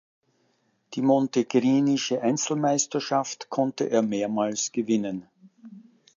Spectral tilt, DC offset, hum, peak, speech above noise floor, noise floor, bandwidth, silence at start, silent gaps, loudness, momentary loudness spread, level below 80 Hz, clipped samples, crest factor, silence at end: -4.5 dB/octave; under 0.1%; none; -8 dBFS; 45 dB; -69 dBFS; 7.6 kHz; 0.9 s; none; -25 LUFS; 6 LU; -74 dBFS; under 0.1%; 18 dB; 0.4 s